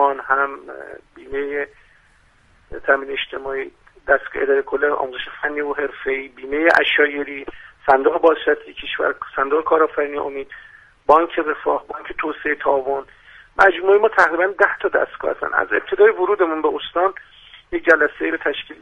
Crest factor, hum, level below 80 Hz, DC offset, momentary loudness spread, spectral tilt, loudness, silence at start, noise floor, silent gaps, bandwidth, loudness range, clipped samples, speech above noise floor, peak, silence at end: 20 dB; none; -52 dBFS; under 0.1%; 14 LU; -4.5 dB/octave; -19 LUFS; 0 s; -55 dBFS; none; 8 kHz; 6 LU; under 0.1%; 36 dB; 0 dBFS; 0.05 s